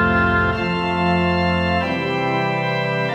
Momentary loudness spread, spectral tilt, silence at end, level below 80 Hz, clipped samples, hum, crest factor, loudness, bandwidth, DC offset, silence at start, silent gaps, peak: 4 LU; -7 dB/octave; 0 s; -40 dBFS; under 0.1%; none; 14 dB; -19 LUFS; 8.4 kHz; under 0.1%; 0 s; none; -6 dBFS